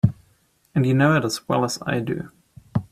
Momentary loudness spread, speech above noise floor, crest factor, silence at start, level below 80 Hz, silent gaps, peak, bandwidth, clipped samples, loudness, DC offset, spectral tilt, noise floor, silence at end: 11 LU; 41 dB; 20 dB; 0.05 s; -52 dBFS; none; -2 dBFS; 15 kHz; under 0.1%; -22 LUFS; under 0.1%; -6 dB/octave; -62 dBFS; 0.05 s